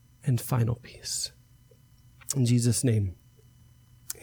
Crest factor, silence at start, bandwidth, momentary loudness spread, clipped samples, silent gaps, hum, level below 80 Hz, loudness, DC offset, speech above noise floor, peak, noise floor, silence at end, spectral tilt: 20 dB; 0.25 s; over 20 kHz; 12 LU; under 0.1%; none; none; -56 dBFS; -28 LUFS; under 0.1%; 31 dB; -10 dBFS; -58 dBFS; 0.1 s; -5 dB/octave